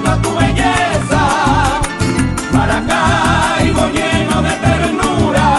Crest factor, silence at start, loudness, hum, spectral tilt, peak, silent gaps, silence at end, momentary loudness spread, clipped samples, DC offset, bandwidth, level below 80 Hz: 12 dB; 0 s; -13 LUFS; none; -5 dB/octave; -2 dBFS; none; 0 s; 3 LU; under 0.1%; under 0.1%; 12.5 kHz; -24 dBFS